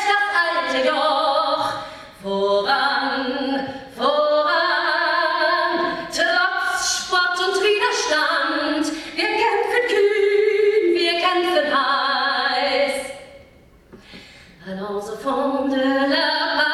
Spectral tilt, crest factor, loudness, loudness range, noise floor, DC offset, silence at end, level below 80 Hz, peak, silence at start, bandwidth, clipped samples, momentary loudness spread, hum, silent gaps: -2 dB/octave; 16 dB; -19 LUFS; 5 LU; -49 dBFS; under 0.1%; 0 s; -58 dBFS; -4 dBFS; 0 s; 13.5 kHz; under 0.1%; 8 LU; none; none